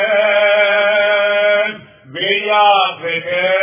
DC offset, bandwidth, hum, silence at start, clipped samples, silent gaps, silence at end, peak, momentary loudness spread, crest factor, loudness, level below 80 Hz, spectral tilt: under 0.1%; 3.7 kHz; none; 0 s; under 0.1%; none; 0 s; -2 dBFS; 9 LU; 12 dB; -13 LUFS; -66 dBFS; -6 dB/octave